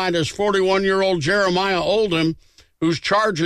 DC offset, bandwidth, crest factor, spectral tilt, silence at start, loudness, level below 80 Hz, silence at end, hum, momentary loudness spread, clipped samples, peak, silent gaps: under 0.1%; 12.5 kHz; 10 dB; -5 dB/octave; 0 s; -19 LUFS; -48 dBFS; 0 s; none; 5 LU; under 0.1%; -8 dBFS; none